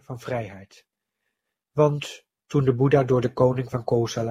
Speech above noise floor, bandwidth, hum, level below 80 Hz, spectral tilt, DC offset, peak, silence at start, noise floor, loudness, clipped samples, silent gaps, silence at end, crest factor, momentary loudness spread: 58 dB; 12.5 kHz; none; -56 dBFS; -7 dB/octave; under 0.1%; -6 dBFS; 0.1 s; -80 dBFS; -23 LUFS; under 0.1%; none; 0 s; 18 dB; 12 LU